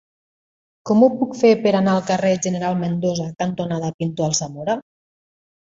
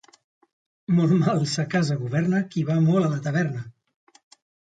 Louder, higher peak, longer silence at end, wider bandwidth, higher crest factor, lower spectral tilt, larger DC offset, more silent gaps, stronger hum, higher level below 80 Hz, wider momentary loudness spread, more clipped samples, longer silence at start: first, -20 LUFS vs -23 LUFS; first, -2 dBFS vs -10 dBFS; second, 0.85 s vs 1.05 s; second, 8 kHz vs 9.2 kHz; about the same, 18 dB vs 14 dB; second, -5.5 dB/octave vs -7 dB/octave; neither; first, 3.94-3.99 s vs none; neither; about the same, -60 dBFS vs -64 dBFS; about the same, 9 LU vs 8 LU; neither; about the same, 0.85 s vs 0.9 s